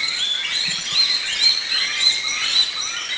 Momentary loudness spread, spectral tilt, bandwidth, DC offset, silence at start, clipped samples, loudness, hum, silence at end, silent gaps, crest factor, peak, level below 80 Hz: 4 LU; 2 dB/octave; 8 kHz; under 0.1%; 0 s; under 0.1%; -17 LUFS; none; 0 s; none; 16 dB; -4 dBFS; -60 dBFS